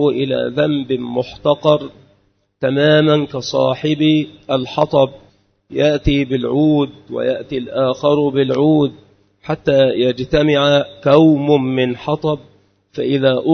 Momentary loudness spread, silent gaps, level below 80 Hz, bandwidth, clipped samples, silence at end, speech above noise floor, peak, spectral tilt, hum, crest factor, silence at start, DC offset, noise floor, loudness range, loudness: 9 LU; none; -40 dBFS; 6.6 kHz; under 0.1%; 0 s; 44 dB; 0 dBFS; -7 dB/octave; none; 16 dB; 0 s; under 0.1%; -59 dBFS; 3 LU; -16 LUFS